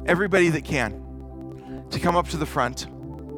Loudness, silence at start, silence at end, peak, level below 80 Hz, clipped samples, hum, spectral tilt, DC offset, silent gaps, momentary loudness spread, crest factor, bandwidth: -23 LUFS; 0 s; 0 s; -6 dBFS; -40 dBFS; under 0.1%; none; -5.5 dB/octave; under 0.1%; none; 19 LU; 20 dB; 17.5 kHz